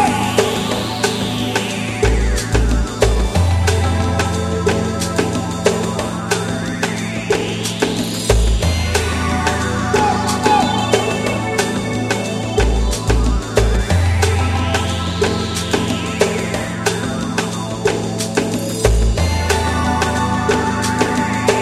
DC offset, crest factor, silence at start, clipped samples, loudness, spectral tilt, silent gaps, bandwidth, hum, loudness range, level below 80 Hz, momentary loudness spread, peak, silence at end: under 0.1%; 16 dB; 0 s; under 0.1%; -17 LUFS; -4.5 dB/octave; none; 14.5 kHz; none; 2 LU; -24 dBFS; 4 LU; 0 dBFS; 0 s